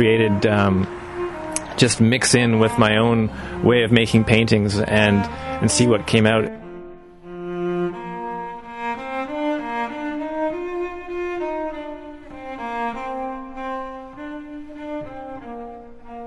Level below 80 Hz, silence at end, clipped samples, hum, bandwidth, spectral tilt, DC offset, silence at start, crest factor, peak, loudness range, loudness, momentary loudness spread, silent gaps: -44 dBFS; 0 s; under 0.1%; none; 11.5 kHz; -5 dB/octave; under 0.1%; 0 s; 20 dB; 0 dBFS; 13 LU; -20 LUFS; 19 LU; none